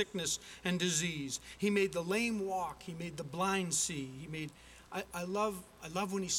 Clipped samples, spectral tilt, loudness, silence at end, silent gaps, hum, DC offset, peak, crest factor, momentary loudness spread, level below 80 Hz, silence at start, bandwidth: under 0.1%; -3.5 dB/octave; -36 LUFS; 0 s; none; none; under 0.1%; -18 dBFS; 18 dB; 12 LU; -64 dBFS; 0 s; 17 kHz